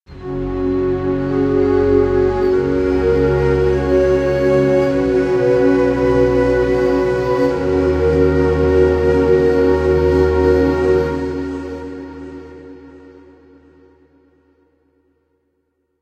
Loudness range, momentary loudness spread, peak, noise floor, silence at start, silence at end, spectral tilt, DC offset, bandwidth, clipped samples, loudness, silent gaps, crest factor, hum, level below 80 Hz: 7 LU; 11 LU; -2 dBFS; -67 dBFS; 0.1 s; 3.05 s; -8 dB/octave; under 0.1%; 8.4 kHz; under 0.1%; -15 LUFS; none; 14 dB; none; -30 dBFS